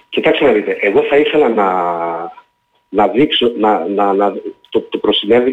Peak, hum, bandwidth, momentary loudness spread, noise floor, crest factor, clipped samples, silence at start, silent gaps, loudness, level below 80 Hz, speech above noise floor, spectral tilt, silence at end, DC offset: -2 dBFS; none; 7.6 kHz; 9 LU; -58 dBFS; 12 dB; under 0.1%; 0.1 s; none; -14 LUFS; -52 dBFS; 45 dB; -6.5 dB/octave; 0 s; under 0.1%